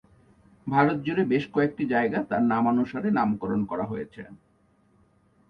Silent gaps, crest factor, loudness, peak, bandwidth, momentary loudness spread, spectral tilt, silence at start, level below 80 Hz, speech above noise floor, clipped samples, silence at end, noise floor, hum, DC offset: none; 20 dB; -25 LUFS; -8 dBFS; 6 kHz; 13 LU; -9 dB/octave; 0.65 s; -60 dBFS; 39 dB; under 0.1%; 1.15 s; -64 dBFS; none; under 0.1%